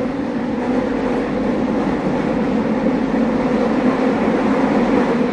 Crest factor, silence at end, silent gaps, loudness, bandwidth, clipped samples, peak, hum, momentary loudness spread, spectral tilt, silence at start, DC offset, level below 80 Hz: 14 dB; 0 s; none; -18 LUFS; 9.4 kHz; under 0.1%; -4 dBFS; none; 3 LU; -7.5 dB/octave; 0 s; under 0.1%; -40 dBFS